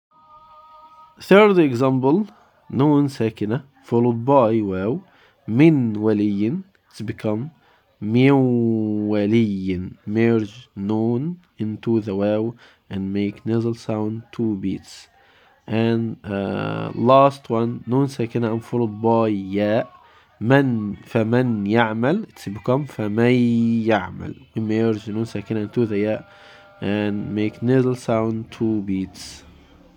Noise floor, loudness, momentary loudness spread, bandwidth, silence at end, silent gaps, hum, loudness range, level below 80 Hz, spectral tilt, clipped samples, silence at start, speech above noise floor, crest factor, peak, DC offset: -54 dBFS; -21 LUFS; 13 LU; 11 kHz; 0.6 s; none; none; 5 LU; -62 dBFS; -8 dB/octave; under 0.1%; 1.2 s; 35 dB; 20 dB; -2 dBFS; under 0.1%